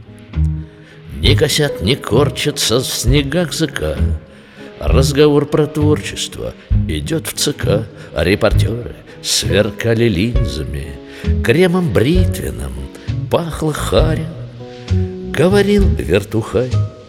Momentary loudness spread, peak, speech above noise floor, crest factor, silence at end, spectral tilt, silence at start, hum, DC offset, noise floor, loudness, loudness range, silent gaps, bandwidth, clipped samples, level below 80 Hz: 14 LU; 0 dBFS; 21 dB; 16 dB; 0 s; -5 dB/octave; 0 s; none; under 0.1%; -36 dBFS; -16 LUFS; 2 LU; none; 17 kHz; under 0.1%; -24 dBFS